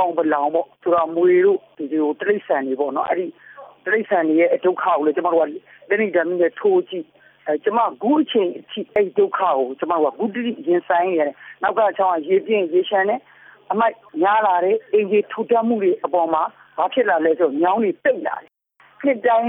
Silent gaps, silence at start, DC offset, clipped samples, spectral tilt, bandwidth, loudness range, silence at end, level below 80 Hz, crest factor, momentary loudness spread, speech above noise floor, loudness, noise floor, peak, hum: none; 0 s; under 0.1%; under 0.1%; -9.5 dB/octave; 3.8 kHz; 1 LU; 0 s; -70 dBFS; 14 dB; 8 LU; 36 dB; -19 LUFS; -55 dBFS; -6 dBFS; none